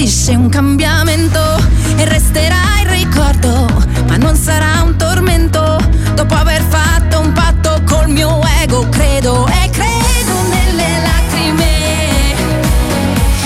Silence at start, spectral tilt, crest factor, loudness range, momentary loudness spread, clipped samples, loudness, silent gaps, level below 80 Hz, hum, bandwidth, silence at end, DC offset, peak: 0 s; -5 dB/octave; 10 dB; 1 LU; 2 LU; under 0.1%; -11 LUFS; none; -14 dBFS; none; 16 kHz; 0 s; under 0.1%; 0 dBFS